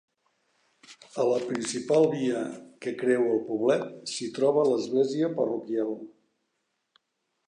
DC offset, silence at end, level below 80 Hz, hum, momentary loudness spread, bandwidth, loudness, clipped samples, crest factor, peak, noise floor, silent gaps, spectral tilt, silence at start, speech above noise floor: under 0.1%; 1.4 s; -80 dBFS; none; 11 LU; 10.5 kHz; -27 LUFS; under 0.1%; 18 dB; -10 dBFS; -79 dBFS; none; -5 dB/octave; 0.9 s; 53 dB